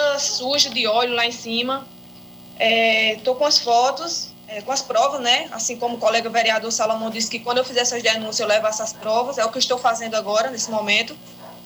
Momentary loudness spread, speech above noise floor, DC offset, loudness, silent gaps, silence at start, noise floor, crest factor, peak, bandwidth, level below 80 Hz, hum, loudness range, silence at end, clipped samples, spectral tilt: 10 LU; 21 dB; under 0.1%; -20 LUFS; none; 0 s; -42 dBFS; 18 dB; -4 dBFS; over 20 kHz; -66 dBFS; 60 Hz at -50 dBFS; 2 LU; 0 s; under 0.1%; -1 dB/octave